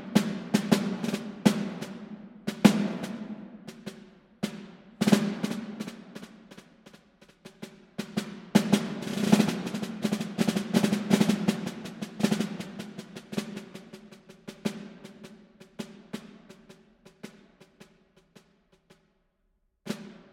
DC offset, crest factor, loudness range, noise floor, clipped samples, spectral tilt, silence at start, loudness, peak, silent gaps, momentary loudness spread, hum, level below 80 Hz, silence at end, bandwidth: under 0.1%; 28 dB; 19 LU; -73 dBFS; under 0.1%; -5.5 dB/octave; 0 s; -29 LUFS; -2 dBFS; none; 23 LU; none; -68 dBFS; 0.15 s; 16.5 kHz